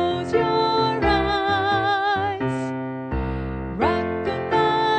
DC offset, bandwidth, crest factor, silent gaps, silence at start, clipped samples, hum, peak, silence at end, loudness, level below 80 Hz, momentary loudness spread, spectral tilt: under 0.1%; 9.2 kHz; 14 dB; none; 0 s; under 0.1%; none; -8 dBFS; 0 s; -22 LUFS; -38 dBFS; 8 LU; -6.5 dB/octave